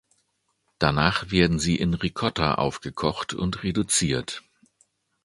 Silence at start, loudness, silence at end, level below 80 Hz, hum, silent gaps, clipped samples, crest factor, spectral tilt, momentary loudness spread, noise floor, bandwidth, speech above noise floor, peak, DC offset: 0.8 s; -24 LUFS; 0.85 s; -44 dBFS; none; none; under 0.1%; 24 dB; -4.5 dB/octave; 7 LU; -73 dBFS; 11.5 kHz; 49 dB; -2 dBFS; under 0.1%